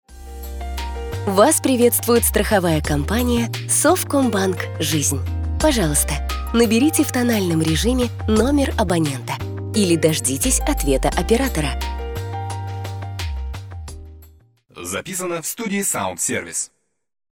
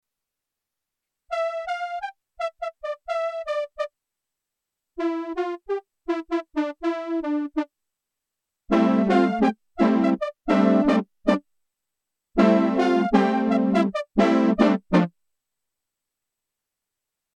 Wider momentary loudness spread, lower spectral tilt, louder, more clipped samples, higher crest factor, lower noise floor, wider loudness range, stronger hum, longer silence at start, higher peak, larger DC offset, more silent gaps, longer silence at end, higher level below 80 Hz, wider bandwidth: about the same, 13 LU vs 12 LU; second, -4.5 dB/octave vs -7.5 dB/octave; first, -19 LUFS vs -23 LUFS; neither; about the same, 18 dB vs 20 dB; second, -51 dBFS vs -86 dBFS; about the same, 9 LU vs 10 LU; neither; second, 0.1 s vs 1.3 s; first, 0 dBFS vs -4 dBFS; neither; neither; second, 0.65 s vs 2.3 s; first, -30 dBFS vs -56 dBFS; first, over 20 kHz vs 9.2 kHz